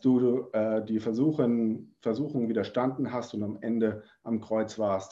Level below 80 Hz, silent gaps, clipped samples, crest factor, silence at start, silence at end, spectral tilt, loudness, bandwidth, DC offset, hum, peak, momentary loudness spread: -66 dBFS; none; under 0.1%; 16 dB; 0.05 s; 0 s; -8 dB/octave; -29 LUFS; 7.6 kHz; under 0.1%; none; -12 dBFS; 8 LU